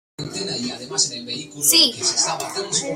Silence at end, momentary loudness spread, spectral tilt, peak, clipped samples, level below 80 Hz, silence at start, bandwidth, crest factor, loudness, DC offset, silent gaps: 0 s; 15 LU; -1 dB/octave; -2 dBFS; under 0.1%; -62 dBFS; 0.2 s; 16 kHz; 20 dB; -19 LUFS; under 0.1%; none